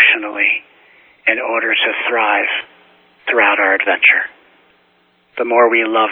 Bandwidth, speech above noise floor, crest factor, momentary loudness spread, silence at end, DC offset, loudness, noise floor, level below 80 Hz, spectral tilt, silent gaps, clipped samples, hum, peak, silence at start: 4.1 kHz; 43 dB; 16 dB; 11 LU; 0 s; under 0.1%; -14 LUFS; -56 dBFS; -64 dBFS; -5 dB/octave; none; under 0.1%; none; 0 dBFS; 0 s